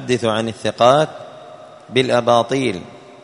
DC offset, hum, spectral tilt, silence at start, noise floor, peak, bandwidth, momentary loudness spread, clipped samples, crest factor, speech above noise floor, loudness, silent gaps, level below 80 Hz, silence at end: under 0.1%; none; -5 dB/octave; 0 s; -39 dBFS; 0 dBFS; 11 kHz; 14 LU; under 0.1%; 18 dB; 23 dB; -17 LUFS; none; -56 dBFS; 0.25 s